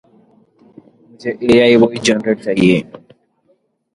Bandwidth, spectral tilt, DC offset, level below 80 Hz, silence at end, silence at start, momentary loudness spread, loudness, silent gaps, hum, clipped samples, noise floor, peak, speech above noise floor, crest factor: 11.5 kHz; -5 dB/octave; under 0.1%; -52 dBFS; 0.95 s; 1.25 s; 16 LU; -13 LUFS; none; none; under 0.1%; -60 dBFS; 0 dBFS; 47 dB; 16 dB